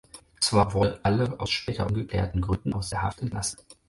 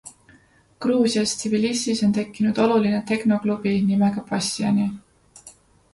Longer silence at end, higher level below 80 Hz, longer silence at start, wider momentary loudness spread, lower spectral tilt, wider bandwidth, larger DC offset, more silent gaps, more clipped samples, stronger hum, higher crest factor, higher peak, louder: second, 0.15 s vs 0.45 s; first, -40 dBFS vs -58 dBFS; about the same, 0.15 s vs 0.05 s; first, 8 LU vs 5 LU; about the same, -5 dB/octave vs -5 dB/octave; about the same, 11.5 kHz vs 11.5 kHz; neither; neither; neither; neither; about the same, 20 dB vs 16 dB; about the same, -8 dBFS vs -6 dBFS; second, -27 LUFS vs -22 LUFS